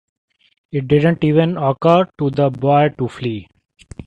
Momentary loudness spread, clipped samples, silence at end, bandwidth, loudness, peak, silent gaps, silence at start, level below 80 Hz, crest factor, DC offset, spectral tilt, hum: 11 LU; under 0.1%; 0.05 s; 8.6 kHz; -16 LUFS; 0 dBFS; none; 0.75 s; -50 dBFS; 16 dB; under 0.1%; -8.5 dB/octave; none